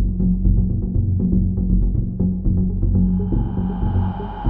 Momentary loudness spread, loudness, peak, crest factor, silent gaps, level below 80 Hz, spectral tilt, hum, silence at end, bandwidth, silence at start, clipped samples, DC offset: 4 LU; -20 LUFS; -4 dBFS; 14 dB; none; -22 dBFS; -13.5 dB/octave; none; 0 s; 3.3 kHz; 0 s; under 0.1%; under 0.1%